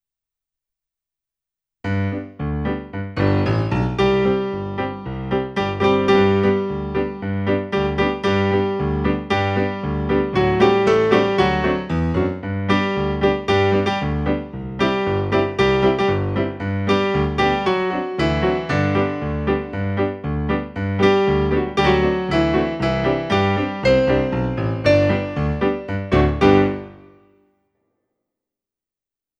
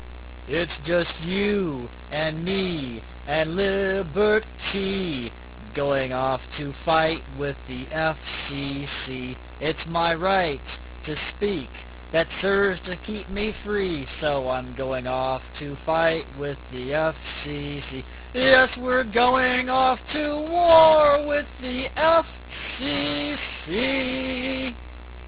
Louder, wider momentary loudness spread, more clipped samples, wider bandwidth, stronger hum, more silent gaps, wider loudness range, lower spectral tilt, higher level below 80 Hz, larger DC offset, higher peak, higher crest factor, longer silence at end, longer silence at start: first, -19 LUFS vs -24 LUFS; second, 9 LU vs 14 LU; neither; first, 8.8 kHz vs 4 kHz; neither; neither; second, 3 LU vs 7 LU; second, -7.5 dB/octave vs -9 dB/octave; first, -34 dBFS vs -42 dBFS; neither; about the same, 0 dBFS vs -2 dBFS; about the same, 20 dB vs 22 dB; first, 2.45 s vs 0 s; first, 1.85 s vs 0 s